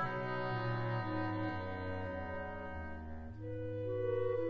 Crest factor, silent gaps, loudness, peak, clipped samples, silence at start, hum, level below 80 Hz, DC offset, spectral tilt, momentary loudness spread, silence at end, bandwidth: 14 dB; none; -40 LUFS; -26 dBFS; under 0.1%; 0 s; none; -56 dBFS; under 0.1%; -6 dB/octave; 9 LU; 0 s; 6.2 kHz